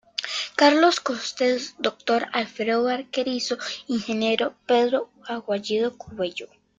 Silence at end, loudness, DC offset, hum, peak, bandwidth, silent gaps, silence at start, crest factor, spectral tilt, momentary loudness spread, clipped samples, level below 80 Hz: 0.35 s; -24 LUFS; under 0.1%; none; -4 dBFS; 9.2 kHz; none; 0.2 s; 20 dB; -3 dB/octave; 11 LU; under 0.1%; -68 dBFS